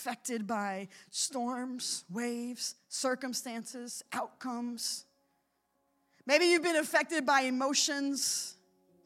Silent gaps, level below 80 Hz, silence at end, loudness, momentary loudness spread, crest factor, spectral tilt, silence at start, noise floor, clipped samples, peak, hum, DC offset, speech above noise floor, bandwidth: none; under -90 dBFS; 0.5 s; -32 LUFS; 13 LU; 22 dB; -1.5 dB/octave; 0 s; -78 dBFS; under 0.1%; -12 dBFS; none; under 0.1%; 45 dB; 16.5 kHz